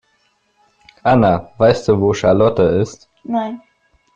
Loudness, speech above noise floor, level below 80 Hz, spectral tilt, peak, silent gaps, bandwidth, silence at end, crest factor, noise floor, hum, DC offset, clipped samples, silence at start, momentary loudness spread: -15 LUFS; 47 dB; -46 dBFS; -7 dB/octave; -2 dBFS; none; 9 kHz; 0.6 s; 14 dB; -61 dBFS; none; under 0.1%; under 0.1%; 1.05 s; 12 LU